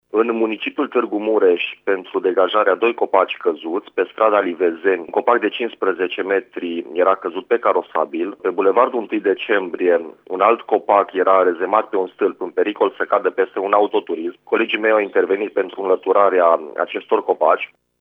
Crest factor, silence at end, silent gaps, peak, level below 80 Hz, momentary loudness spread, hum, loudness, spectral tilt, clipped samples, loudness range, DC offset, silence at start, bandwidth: 18 dB; 0.35 s; none; 0 dBFS; -78 dBFS; 7 LU; none; -18 LUFS; -7 dB/octave; under 0.1%; 2 LU; under 0.1%; 0.15 s; 3.9 kHz